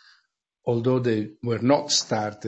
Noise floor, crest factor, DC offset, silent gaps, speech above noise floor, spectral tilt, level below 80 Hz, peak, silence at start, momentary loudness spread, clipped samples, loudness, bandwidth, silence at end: -70 dBFS; 20 dB; under 0.1%; none; 46 dB; -4.5 dB/octave; -66 dBFS; -6 dBFS; 0.65 s; 8 LU; under 0.1%; -24 LUFS; 8.2 kHz; 0 s